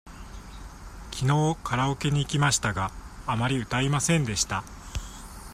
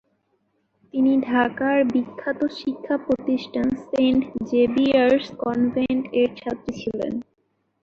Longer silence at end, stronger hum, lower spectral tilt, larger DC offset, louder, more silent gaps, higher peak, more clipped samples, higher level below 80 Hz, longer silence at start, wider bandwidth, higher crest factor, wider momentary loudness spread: second, 0 s vs 0.6 s; neither; second, -4.5 dB/octave vs -6.5 dB/octave; neither; second, -26 LUFS vs -22 LUFS; neither; about the same, -8 dBFS vs -6 dBFS; neither; first, -44 dBFS vs -56 dBFS; second, 0.05 s vs 0.95 s; first, 15 kHz vs 6.8 kHz; about the same, 18 dB vs 18 dB; first, 21 LU vs 11 LU